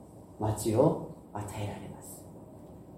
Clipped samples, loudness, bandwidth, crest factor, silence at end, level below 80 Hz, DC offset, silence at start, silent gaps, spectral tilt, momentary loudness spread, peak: under 0.1%; -32 LUFS; 16.5 kHz; 22 dB; 0 s; -56 dBFS; under 0.1%; 0 s; none; -7 dB/octave; 23 LU; -10 dBFS